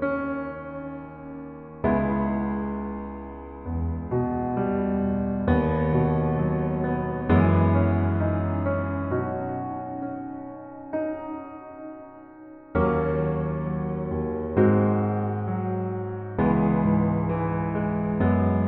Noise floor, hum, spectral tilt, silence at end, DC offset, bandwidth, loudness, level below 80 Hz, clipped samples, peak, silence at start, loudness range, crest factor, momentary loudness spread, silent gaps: -45 dBFS; none; -12.5 dB/octave; 0 s; under 0.1%; 4.1 kHz; -25 LUFS; -42 dBFS; under 0.1%; -8 dBFS; 0 s; 7 LU; 18 dB; 17 LU; none